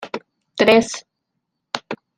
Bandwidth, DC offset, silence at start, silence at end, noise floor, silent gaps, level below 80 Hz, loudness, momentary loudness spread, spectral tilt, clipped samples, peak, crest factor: 16 kHz; under 0.1%; 0 s; 0.2 s; -77 dBFS; none; -60 dBFS; -17 LUFS; 19 LU; -3.5 dB/octave; under 0.1%; -2 dBFS; 20 dB